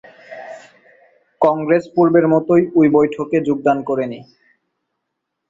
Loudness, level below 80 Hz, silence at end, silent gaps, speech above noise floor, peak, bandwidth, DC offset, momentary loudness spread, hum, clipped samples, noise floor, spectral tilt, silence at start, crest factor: -16 LUFS; -60 dBFS; 1.3 s; none; 62 dB; -2 dBFS; 7.6 kHz; under 0.1%; 22 LU; none; under 0.1%; -77 dBFS; -9 dB/octave; 0.3 s; 16 dB